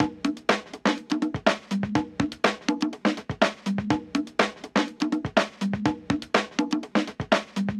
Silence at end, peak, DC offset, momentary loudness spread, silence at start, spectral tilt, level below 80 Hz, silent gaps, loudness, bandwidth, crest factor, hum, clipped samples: 0 s; -6 dBFS; under 0.1%; 3 LU; 0 s; -5 dB/octave; -54 dBFS; none; -26 LUFS; 12 kHz; 20 dB; none; under 0.1%